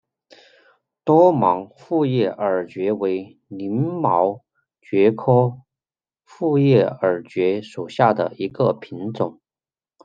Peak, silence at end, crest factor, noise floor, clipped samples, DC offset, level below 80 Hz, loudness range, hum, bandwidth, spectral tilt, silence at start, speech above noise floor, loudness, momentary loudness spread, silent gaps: -2 dBFS; 0.7 s; 18 dB; under -90 dBFS; under 0.1%; under 0.1%; -68 dBFS; 2 LU; none; 7.6 kHz; -9 dB/octave; 1.05 s; over 71 dB; -20 LUFS; 12 LU; none